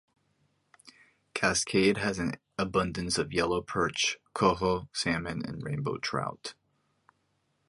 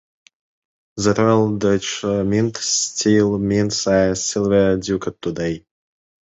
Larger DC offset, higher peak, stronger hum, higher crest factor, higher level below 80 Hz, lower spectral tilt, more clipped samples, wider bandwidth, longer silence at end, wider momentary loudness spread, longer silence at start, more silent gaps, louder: neither; second, -12 dBFS vs -2 dBFS; neither; about the same, 20 dB vs 16 dB; second, -54 dBFS vs -46 dBFS; about the same, -4 dB/octave vs -4.5 dB/octave; neither; first, 11.5 kHz vs 8.2 kHz; first, 1.15 s vs 0.75 s; about the same, 10 LU vs 8 LU; about the same, 0.85 s vs 0.95 s; neither; second, -30 LUFS vs -18 LUFS